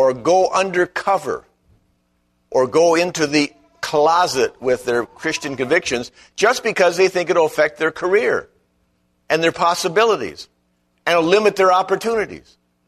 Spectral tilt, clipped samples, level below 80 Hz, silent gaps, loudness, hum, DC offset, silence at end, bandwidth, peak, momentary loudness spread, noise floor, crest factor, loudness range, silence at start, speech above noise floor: -3.5 dB/octave; under 0.1%; -56 dBFS; none; -18 LUFS; none; under 0.1%; 0.5 s; 13.5 kHz; -2 dBFS; 9 LU; -65 dBFS; 16 dB; 2 LU; 0 s; 48 dB